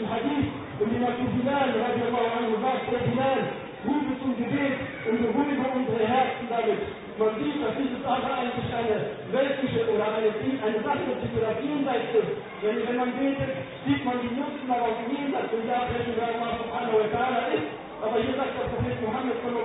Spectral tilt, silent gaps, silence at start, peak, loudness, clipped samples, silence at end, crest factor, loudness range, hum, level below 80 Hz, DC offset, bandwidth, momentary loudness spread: -10.5 dB/octave; none; 0 s; -12 dBFS; -27 LUFS; under 0.1%; 0 s; 16 dB; 2 LU; none; -52 dBFS; under 0.1%; 4 kHz; 5 LU